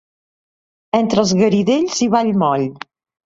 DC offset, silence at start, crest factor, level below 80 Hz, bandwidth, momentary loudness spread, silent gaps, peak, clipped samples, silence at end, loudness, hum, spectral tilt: under 0.1%; 0.95 s; 16 dB; -56 dBFS; 8 kHz; 10 LU; none; -2 dBFS; under 0.1%; 0.6 s; -16 LUFS; none; -5.5 dB/octave